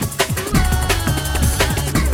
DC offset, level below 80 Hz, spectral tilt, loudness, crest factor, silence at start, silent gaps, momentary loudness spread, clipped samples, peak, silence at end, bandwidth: under 0.1%; -22 dBFS; -4 dB/octave; -18 LUFS; 16 dB; 0 s; none; 2 LU; under 0.1%; -2 dBFS; 0 s; 18 kHz